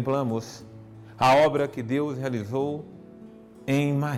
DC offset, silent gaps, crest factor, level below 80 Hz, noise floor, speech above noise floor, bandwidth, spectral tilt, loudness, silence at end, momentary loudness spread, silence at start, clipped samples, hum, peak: under 0.1%; none; 14 dB; -62 dBFS; -47 dBFS; 22 dB; 15.5 kHz; -6.5 dB/octave; -25 LUFS; 0 s; 26 LU; 0 s; under 0.1%; none; -12 dBFS